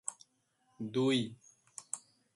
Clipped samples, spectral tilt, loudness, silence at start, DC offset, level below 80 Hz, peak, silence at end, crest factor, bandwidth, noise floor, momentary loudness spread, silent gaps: under 0.1%; -4.5 dB/octave; -36 LUFS; 0.05 s; under 0.1%; -78 dBFS; -18 dBFS; 0.35 s; 20 dB; 11.5 kHz; -76 dBFS; 18 LU; none